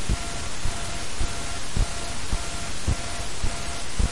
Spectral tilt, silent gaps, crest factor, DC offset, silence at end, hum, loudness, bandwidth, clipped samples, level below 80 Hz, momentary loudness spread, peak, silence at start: -3.5 dB/octave; none; 16 dB; 4%; 0 s; none; -30 LUFS; 11.5 kHz; under 0.1%; -30 dBFS; 3 LU; -8 dBFS; 0 s